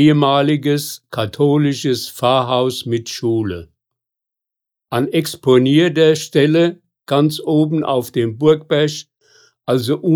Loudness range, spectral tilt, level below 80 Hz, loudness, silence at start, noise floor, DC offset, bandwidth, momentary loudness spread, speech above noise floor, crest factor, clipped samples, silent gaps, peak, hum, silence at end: 5 LU; -6 dB/octave; -58 dBFS; -16 LUFS; 0 s; -84 dBFS; under 0.1%; 19.5 kHz; 9 LU; 69 dB; 14 dB; under 0.1%; none; -2 dBFS; none; 0 s